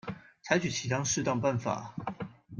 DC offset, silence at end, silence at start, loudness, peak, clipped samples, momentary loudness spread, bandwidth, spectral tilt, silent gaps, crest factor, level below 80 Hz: under 0.1%; 0 s; 0.05 s; -31 LUFS; -12 dBFS; under 0.1%; 14 LU; 10.5 kHz; -4 dB/octave; none; 20 dB; -64 dBFS